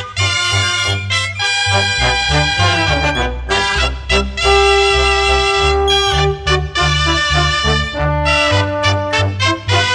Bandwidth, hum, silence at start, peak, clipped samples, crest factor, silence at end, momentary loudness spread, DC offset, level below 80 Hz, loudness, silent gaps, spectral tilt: 10.5 kHz; none; 0 s; 0 dBFS; under 0.1%; 14 dB; 0 s; 5 LU; under 0.1%; -24 dBFS; -13 LUFS; none; -3.5 dB/octave